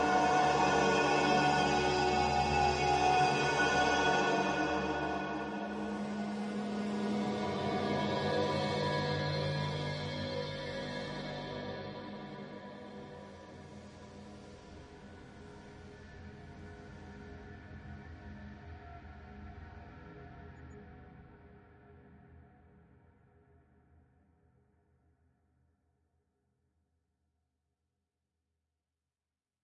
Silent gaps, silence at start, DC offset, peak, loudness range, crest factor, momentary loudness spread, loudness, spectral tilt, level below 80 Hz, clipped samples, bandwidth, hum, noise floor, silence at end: none; 0 s; under 0.1%; -16 dBFS; 22 LU; 20 dB; 23 LU; -32 LUFS; -4.5 dB/octave; -58 dBFS; under 0.1%; 11 kHz; none; under -90 dBFS; 7.25 s